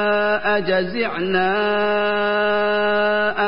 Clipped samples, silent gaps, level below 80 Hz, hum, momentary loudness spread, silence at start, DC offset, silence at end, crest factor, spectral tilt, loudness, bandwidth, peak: under 0.1%; none; -54 dBFS; none; 2 LU; 0 s; 2%; 0 s; 14 dB; -10 dB/octave; -19 LUFS; 5.4 kHz; -6 dBFS